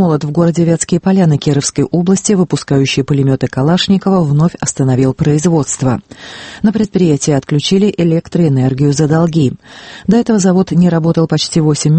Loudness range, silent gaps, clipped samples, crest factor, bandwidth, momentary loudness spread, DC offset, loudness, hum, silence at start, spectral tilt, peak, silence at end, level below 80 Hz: 1 LU; none; under 0.1%; 12 dB; 8.8 kHz; 4 LU; under 0.1%; -12 LUFS; none; 0 s; -6 dB/octave; 0 dBFS; 0 s; -42 dBFS